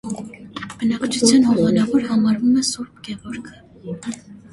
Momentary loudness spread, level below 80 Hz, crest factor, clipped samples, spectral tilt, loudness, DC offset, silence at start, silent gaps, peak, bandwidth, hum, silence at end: 19 LU; -54 dBFS; 18 dB; under 0.1%; -4.5 dB/octave; -18 LUFS; under 0.1%; 0.05 s; none; 0 dBFS; 11.5 kHz; none; 0.1 s